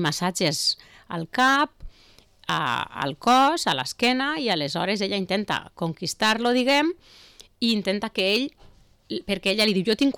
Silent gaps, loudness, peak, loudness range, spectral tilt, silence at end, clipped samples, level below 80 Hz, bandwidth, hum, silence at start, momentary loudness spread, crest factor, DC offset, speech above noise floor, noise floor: none; -23 LUFS; -12 dBFS; 2 LU; -3.5 dB/octave; 0.05 s; under 0.1%; -54 dBFS; 19 kHz; none; 0 s; 10 LU; 12 dB; under 0.1%; 31 dB; -55 dBFS